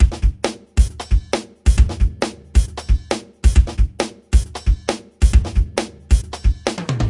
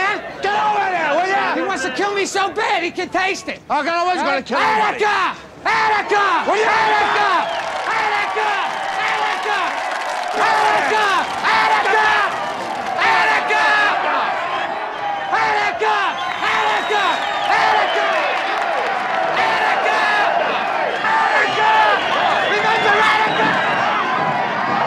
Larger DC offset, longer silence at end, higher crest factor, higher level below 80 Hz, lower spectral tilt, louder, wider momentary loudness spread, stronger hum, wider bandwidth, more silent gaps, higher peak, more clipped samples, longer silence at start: neither; about the same, 0 s vs 0 s; about the same, 16 dB vs 14 dB; first, -18 dBFS vs -58 dBFS; first, -5.5 dB/octave vs -2.5 dB/octave; second, -20 LUFS vs -17 LUFS; about the same, 8 LU vs 7 LU; neither; second, 11.5 kHz vs 13.5 kHz; neither; about the same, 0 dBFS vs -2 dBFS; neither; about the same, 0 s vs 0 s